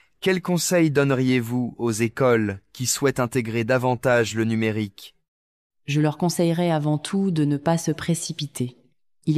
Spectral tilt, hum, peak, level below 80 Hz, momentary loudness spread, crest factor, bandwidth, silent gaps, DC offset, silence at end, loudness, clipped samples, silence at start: -5.5 dB/octave; none; -8 dBFS; -58 dBFS; 9 LU; 16 dB; 14.5 kHz; 5.28-5.70 s; under 0.1%; 0 s; -23 LUFS; under 0.1%; 0.2 s